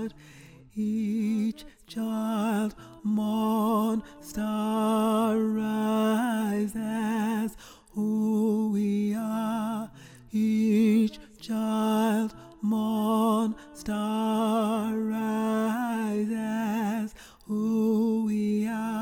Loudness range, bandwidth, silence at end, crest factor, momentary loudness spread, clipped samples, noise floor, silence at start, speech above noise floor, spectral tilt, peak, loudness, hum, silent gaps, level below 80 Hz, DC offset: 2 LU; 17 kHz; 0 s; 12 dB; 9 LU; under 0.1%; -47 dBFS; 0 s; 19 dB; -6.5 dB/octave; -14 dBFS; -27 LUFS; none; none; -60 dBFS; under 0.1%